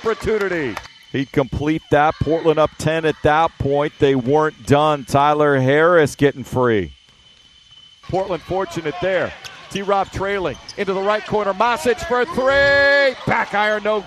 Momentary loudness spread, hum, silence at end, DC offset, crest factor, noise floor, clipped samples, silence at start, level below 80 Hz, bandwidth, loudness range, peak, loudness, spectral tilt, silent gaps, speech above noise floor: 10 LU; none; 0 s; under 0.1%; 18 dB; -50 dBFS; under 0.1%; 0 s; -42 dBFS; 13.5 kHz; 7 LU; 0 dBFS; -18 LUFS; -5.5 dB/octave; none; 32 dB